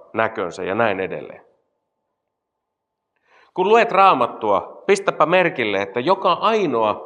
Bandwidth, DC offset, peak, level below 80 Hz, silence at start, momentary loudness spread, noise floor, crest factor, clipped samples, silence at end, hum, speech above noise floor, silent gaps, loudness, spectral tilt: 11 kHz; under 0.1%; -2 dBFS; -72 dBFS; 0.15 s; 10 LU; -79 dBFS; 18 dB; under 0.1%; 0 s; none; 61 dB; none; -18 LUFS; -5 dB/octave